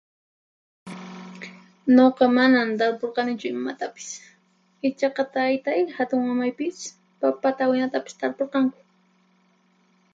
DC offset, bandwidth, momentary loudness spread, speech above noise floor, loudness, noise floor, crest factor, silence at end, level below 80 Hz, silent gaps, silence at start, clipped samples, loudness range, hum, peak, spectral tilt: under 0.1%; 7.8 kHz; 21 LU; 41 dB; -23 LUFS; -63 dBFS; 20 dB; 1.4 s; -74 dBFS; none; 0.85 s; under 0.1%; 5 LU; none; -4 dBFS; -4.5 dB/octave